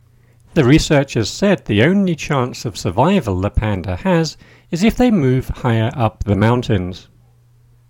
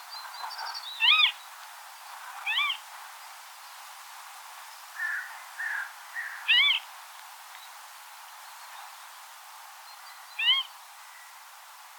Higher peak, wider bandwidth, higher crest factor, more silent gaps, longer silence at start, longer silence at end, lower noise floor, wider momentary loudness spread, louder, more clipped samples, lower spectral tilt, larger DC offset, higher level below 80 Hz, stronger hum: first, 0 dBFS vs -10 dBFS; second, 17 kHz vs 19 kHz; second, 16 dB vs 22 dB; neither; first, 0.55 s vs 0 s; first, 0.9 s vs 0 s; about the same, -50 dBFS vs -49 dBFS; second, 8 LU vs 24 LU; first, -16 LUFS vs -26 LUFS; neither; first, -6.5 dB/octave vs 9.5 dB/octave; neither; first, -32 dBFS vs under -90 dBFS; neither